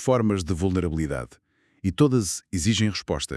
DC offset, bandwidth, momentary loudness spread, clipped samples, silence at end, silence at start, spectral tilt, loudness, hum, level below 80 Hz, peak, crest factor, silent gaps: under 0.1%; 12 kHz; 10 LU; under 0.1%; 0 s; 0 s; -5.5 dB/octave; -24 LUFS; none; -44 dBFS; -6 dBFS; 18 dB; none